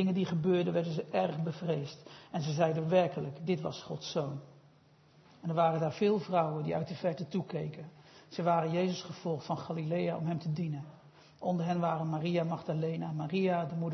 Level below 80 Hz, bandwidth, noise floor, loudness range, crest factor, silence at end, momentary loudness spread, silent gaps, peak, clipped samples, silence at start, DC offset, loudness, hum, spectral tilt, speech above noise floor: -76 dBFS; 6.2 kHz; -63 dBFS; 2 LU; 18 dB; 0 s; 10 LU; none; -14 dBFS; under 0.1%; 0 s; under 0.1%; -33 LUFS; none; -6.5 dB/octave; 30 dB